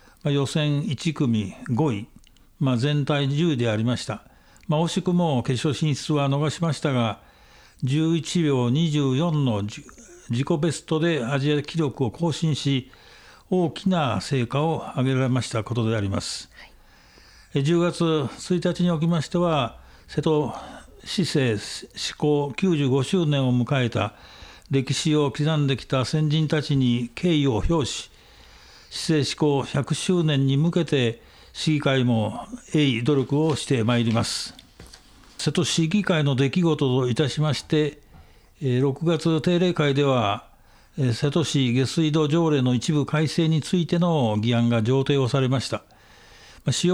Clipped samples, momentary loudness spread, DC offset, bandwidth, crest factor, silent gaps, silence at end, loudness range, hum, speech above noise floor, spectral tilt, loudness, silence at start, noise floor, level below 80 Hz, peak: under 0.1%; 8 LU; under 0.1%; 12 kHz; 14 dB; none; 0 s; 3 LU; none; 30 dB; -6 dB/octave; -23 LUFS; 0.25 s; -52 dBFS; -50 dBFS; -8 dBFS